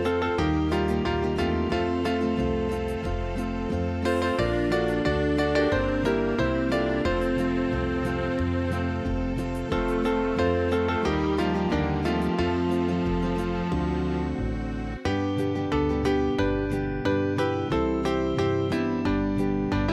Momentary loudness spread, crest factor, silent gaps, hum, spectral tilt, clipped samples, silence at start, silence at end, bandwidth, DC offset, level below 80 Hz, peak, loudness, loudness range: 4 LU; 14 dB; none; none; -7 dB/octave; under 0.1%; 0 s; 0 s; 13.5 kHz; under 0.1%; -36 dBFS; -10 dBFS; -26 LUFS; 2 LU